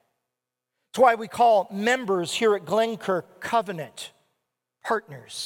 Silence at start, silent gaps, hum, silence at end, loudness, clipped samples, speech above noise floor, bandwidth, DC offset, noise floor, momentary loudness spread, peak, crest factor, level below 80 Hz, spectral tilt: 0.95 s; none; none; 0 s; -23 LUFS; under 0.1%; 62 dB; 17.5 kHz; under 0.1%; -85 dBFS; 17 LU; -6 dBFS; 18 dB; -72 dBFS; -4 dB/octave